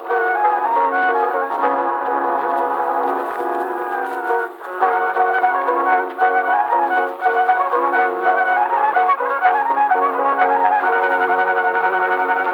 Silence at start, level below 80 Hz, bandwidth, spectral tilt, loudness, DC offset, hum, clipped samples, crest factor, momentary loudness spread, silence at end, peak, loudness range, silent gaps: 0 s; -78 dBFS; 18.5 kHz; -4 dB/octave; -17 LUFS; under 0.1%; none; under 0.1%; 14 dB; 5 LU; 0 s; -2 dBFS; 4 LU; none